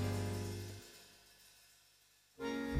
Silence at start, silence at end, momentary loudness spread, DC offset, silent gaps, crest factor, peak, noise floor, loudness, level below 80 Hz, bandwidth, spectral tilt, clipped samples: 0 s; 0 s; 24 LU; under 0.1%; none; 20 dB; -24 dBFS; -70 dBFS; -44 LUFS; -60 dBFS; 16 kHz; -5.5 dB/octave; under 0.1%